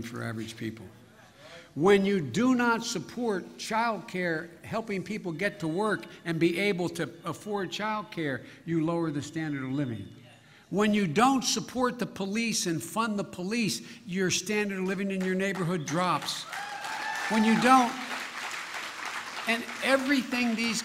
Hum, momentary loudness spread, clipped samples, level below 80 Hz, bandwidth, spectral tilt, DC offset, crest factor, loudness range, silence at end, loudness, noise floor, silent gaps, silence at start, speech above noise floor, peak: none; 12 LU; under 0.1%; -66 dBFS; 16 kHz; -4.5 dB/octave; under 0.1%; 22 dB; 4 LU; 0 s; -29 LUFS; -54 dBFS; none; 0 s; 26 dB; -6 dBFS